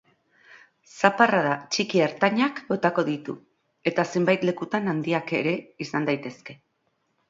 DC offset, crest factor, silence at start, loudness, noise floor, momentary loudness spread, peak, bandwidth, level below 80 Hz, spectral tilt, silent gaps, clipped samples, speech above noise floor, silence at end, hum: under 0.1%; 24 dB; 0.55 s; -24 LUFS; -73 dBFS; 11 LU; 0 dBFS; 7.8 kHz; -72 dBFS; -5.5 dB/octave; none; under 0.1%; 48 dB; 0.75 s; none